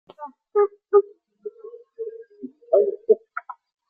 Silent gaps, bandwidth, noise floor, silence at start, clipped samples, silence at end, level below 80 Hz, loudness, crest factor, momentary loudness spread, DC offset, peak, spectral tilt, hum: none; 2.4 kHz; -44 dBFS; 0.2 s; under 0.1%; 0.4 s; -80 dBFS; -21 LUFS; 20 dB; 21 LU; under 0.1%; -6 dBFS; -9 dB/octave; none